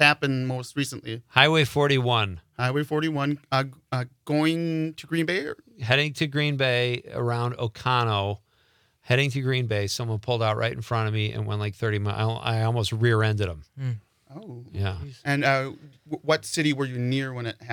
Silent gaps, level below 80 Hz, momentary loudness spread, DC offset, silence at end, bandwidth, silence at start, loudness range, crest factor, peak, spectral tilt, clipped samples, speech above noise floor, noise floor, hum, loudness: none; -60 dBFS; 11 LU; under 0.1%; 0 s; 18 kHz; 0 s; 4 LU; 26 dB; 0 dBFS; -5.5 dB/octave; under 0.1%; 39 dB; -64 dBFS; none; -25 LUFS